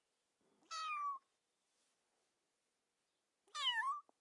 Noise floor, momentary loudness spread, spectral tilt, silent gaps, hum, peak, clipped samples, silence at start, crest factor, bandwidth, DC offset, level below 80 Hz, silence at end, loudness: -88 dBFS; 14 LU; 4 dB/octave; none; none; -28 dBFS; under 0.1%; 0.7 s; 20 dB; 11.5 kHz; under 0.1%; under -90 dBFS; 0.2 s; -42 LUFS